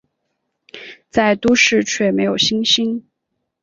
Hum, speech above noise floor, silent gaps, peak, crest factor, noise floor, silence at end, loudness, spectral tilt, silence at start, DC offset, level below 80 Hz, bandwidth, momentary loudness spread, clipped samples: none; 59 dB; none; -2 dBFS; 16 dB; -75 dBFS; 0.65 s; -15 LUFS; -3 dB/octave; 0.75 s; under 0.1%; -52 dBFS; 7.8 kHz; 20 LU; under 0.1%